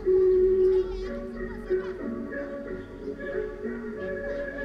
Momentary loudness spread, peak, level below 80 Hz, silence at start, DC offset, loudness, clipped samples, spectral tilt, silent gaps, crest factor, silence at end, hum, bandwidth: 15 LU; -14 dBFS; -44 dBFS; 0 s; under 0.1%; -28 LUFS; under 0.1%; -8 dB/octave; none; 12 dB; 0 s; none; 5.6 kHz